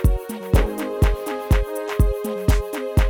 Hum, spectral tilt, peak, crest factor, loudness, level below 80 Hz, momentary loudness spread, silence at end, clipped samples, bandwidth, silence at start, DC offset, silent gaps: none; -6.5 dB/octave; -4 dBFS; 16 dB; -23 LUFS; -22 dBFS; 4 LU; 0 s; under 0.1%; over 20 kHz; 0 s; under 0.1%; none